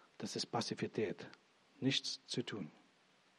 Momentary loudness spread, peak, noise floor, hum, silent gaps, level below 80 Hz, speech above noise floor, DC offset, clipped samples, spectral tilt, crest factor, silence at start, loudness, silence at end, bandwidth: 13 LU; -22 dBFS; -71 dBFS; none; none; -88 dBFS; 30 dB; under 0.1%; under 0.1%; -4 dB/octave; 20 dB; 0.2 s; -41 LUFS; 0.65 s; 12.5 kHz